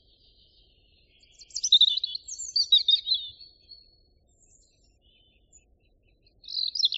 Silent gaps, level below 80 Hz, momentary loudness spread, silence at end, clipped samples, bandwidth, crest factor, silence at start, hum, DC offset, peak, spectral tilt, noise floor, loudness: none; -66 dBFS; 16 LU; 0 s; under 0.1%; 8 kHz; 20 dB; 1.55 s; none; under 0.1%; -10 dBFS; 3.5 dB/octave; -65 dBFS; -22 LUFS